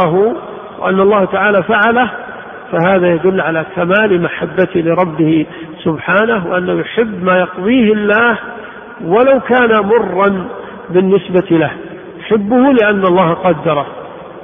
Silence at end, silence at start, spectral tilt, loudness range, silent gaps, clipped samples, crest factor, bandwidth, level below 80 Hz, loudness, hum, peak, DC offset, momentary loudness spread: 0 s; 0 s; -9.5 dB/octave; 2 LU; none; under 0.1%; 12 dB; 3.7 kHz; -48 dBFS; -12 LUFS; none; 0 dBFS; under 0.1%; 16 LU